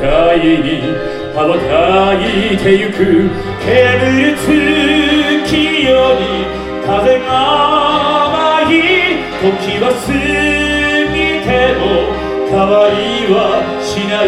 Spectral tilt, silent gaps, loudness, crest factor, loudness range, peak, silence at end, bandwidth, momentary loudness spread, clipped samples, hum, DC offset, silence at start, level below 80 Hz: -5 dB/octave; none; -11 LUFS; 12 dB; 2 LU; 0 dBFS; 0 s; 13.5 kHz; 6 LU; under 0.1%; none; under 0.1%; 0 s; -32 dBFS